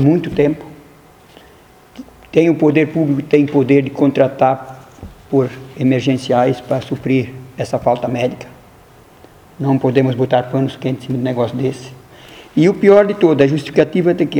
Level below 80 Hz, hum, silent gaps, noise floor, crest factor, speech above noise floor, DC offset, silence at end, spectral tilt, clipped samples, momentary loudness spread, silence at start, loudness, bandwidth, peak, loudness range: -50 dBFS; none; none; -45 dBFS; 16 dB; 31 dB; under 0.1%; 0 s; -8 dB/octave; under 0.1%; 10 LU; 0 s; -15 LUFS; 15 kHz; 0 dBFS; 4 LU